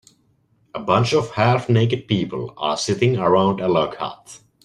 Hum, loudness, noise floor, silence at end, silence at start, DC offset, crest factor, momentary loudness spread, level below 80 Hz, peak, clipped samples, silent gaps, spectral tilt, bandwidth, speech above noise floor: none; -20 LUFS; -61 dBFS; 0.25 s; 0.75 s; under 0.1%; 18 dB; 13 LU; -54 dBFS; -2 dBFS; under 0.1%; none; -6 dB/octave; 11 kHz; 42 dB